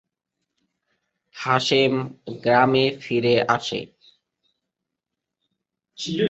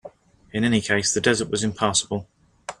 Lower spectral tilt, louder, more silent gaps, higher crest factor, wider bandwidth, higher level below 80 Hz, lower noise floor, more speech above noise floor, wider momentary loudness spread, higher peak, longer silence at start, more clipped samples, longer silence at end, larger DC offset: first, -5 dB/octave vs -3.5 dB/octave; about the same, -21 LUFS vs -22 LUFS; neither; about the same, 22 dB vs 20 dB; second, 8.2 kHz vs 12 kHz; second, -64 dBFS vs -54 dBFS; first, -84 dBFS vs -46 dBFS; first, 63 dB vs 24 dB; about the same, 14 LU vs 12 LU; about the same, -4 dBFS vs -4 dBFS; first, 1.35 s vs 0.05 s; neither; about the same, 0 s vs 0.05 s; neither